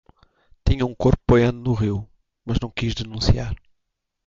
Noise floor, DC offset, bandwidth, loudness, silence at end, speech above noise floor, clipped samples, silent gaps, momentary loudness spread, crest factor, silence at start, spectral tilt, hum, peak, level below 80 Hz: -76 dBFS; under 0.1%; 7.6 kHz; -22 LUFS; 0.7 s; 56 dB; under 0.1%; none; 13 LU; 18 dB; 0.65 s; -7 dB/octave; none; -4 dBFS; -32 dBFS